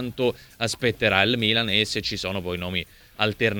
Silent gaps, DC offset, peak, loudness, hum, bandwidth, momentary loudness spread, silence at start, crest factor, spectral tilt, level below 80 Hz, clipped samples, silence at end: none; under 0.1%; -2 dBFS; -23 LUFS; none; over 20 kHz; 9 LU; 0 s; 22 dB; -4 dB/octave; -50 dBFS; under 0.1%; 0 s